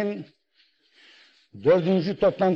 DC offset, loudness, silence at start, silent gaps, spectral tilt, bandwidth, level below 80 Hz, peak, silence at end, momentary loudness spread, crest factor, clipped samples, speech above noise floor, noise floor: under 0.1%; -23 LUFS; 0 s; none; -8.5 dB/octave; 6.6 kHz; -60 dBFS; -10 dBFS; 0 s; 10 LU; 16 dB; under 0.1%; 43 dB; -65 dBFS